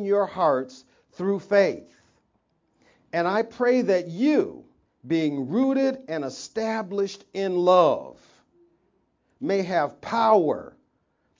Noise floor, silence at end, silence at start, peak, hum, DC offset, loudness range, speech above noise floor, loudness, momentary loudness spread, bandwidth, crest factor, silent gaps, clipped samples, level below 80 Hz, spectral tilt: -70 dBFS; 0.7 s; 0 s; -6 dBFS; none; under 0.1%; 3 LU; 47 dB; -24 LUFS; 12 LU; 7.6 kHz; 20 dB; none; under 0.1%; -70 dBFS; -6 dB/octave